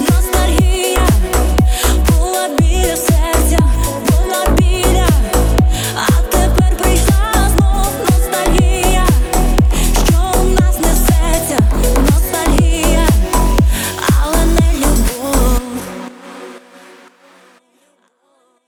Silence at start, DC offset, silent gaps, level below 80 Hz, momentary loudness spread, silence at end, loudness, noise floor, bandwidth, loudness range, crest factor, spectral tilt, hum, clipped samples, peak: 0 s; under 0.1%; none; -14 dBFS; 3 LU; 2.1 s; -13 LUFS; -57 dBFS; 20 kHz; 3 LU; 12 dB; -5 dB/octave; none; under 0.1%; 0 dBFS